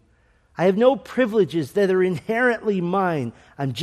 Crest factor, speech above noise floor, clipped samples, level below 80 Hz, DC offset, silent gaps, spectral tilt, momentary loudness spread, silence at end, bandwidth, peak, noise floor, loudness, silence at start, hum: 18 dB; 39 dB; under 0.1%; -60 dBFS; under 0.1%; none; -7 dB/octave; 10 LU; 0 s; 13.5 kHz; -4 dBFS; -59 dBFS; -21 LUFS; 0.6 s; none